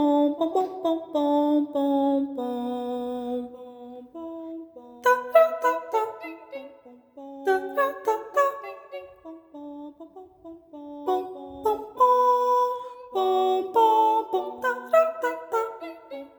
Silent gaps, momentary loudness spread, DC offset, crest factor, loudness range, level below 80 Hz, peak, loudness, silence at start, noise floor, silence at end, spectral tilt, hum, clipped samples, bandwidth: none; 21 LU; under 0.1%; 20 dB; 8 LU; -70 dBFS; -6 dBFS; -24 LUFS; 0 s; -50 dBFS; 0.1 s; -4 dB/octave; none; under 0.1%; over 20 kHz